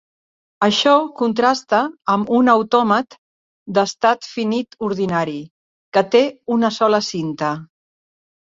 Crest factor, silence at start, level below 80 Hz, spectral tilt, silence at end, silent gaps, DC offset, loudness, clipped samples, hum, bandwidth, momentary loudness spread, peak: 18 dB; 0.6 s; -62 dBFS; -5 dB/octave; 0.8 s; 3.18-3.66 s, 5.51-5.92 s; under 0.1%; -18 LUFS; under 0.1%; none; 7.8 kHz; 9 LU; -2 dBFS